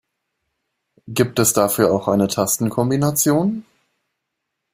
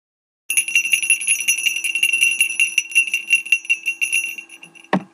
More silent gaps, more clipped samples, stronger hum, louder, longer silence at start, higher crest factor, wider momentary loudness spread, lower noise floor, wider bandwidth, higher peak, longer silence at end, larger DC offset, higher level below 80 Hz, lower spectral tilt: neither; neither; neither; about the same, -18 LUFS vs -16 LUFS; first, 1.05 s vs 0.5 s; about the same, 18 dB vs 18 dB; about the same, 6 LU vs 6 LU; first, -78 dBFS vs -43 dBFS; first, 16 kHz vs 13.5 kHz; about the same, -2 dBFS vs -2 dBFS; first, 1.15 s vs 0.1 s; neither; first, -56 dBFS vs -82 dBFS; first, -5 dB/octave vs 0 dB/octave